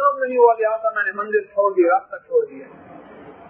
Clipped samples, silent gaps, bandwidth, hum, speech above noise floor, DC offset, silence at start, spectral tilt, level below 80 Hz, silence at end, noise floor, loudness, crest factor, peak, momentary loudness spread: under 0.1%; none; 3.3 kHz; none; 23 dB; under 0.1%; 0 s; -9.5 dB/octave; -72 dBFS; 0.15 s; -41 dBFS; -19 LUFS; 18 dB; -2 dBFS; 7 LU